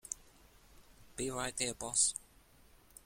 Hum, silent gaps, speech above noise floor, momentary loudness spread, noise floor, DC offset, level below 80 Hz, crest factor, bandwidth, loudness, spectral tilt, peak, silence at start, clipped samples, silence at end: none; none; 27 dB; 16 LU; -63 dBFS; under 0.1%; -62 dBFS; 24 dB; 16.5 kHz; -35 LUFS; -1.5 dB/octave; -16 dBFS; 0.05 s; under 0.1%; 0.85 s